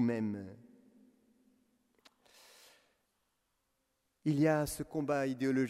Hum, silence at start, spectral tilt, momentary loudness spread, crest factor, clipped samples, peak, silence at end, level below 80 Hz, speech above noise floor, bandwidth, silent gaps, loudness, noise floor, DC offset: none; 0 s; -6.5 dB/octave; 11 LU; 20 dB; under 0.1%; -18 dBFS; 0 s; -66 dBFS; 48 dB; 16 kHz; none; -34 LUFS; -81 dBFS; under 0.1%